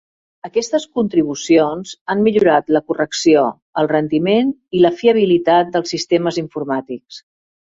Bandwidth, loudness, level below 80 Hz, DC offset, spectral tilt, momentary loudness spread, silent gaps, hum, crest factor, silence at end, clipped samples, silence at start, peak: 7.8 kHz; -16 LUFS; -58 dBFS; under 0.1%; -5 dB/octave; 9 LU; 2.01-2.06 s, 3.62-3.73 s; none; 14 dB; 0.5 s; under 0.1%; 0.45 s; -2 dBFS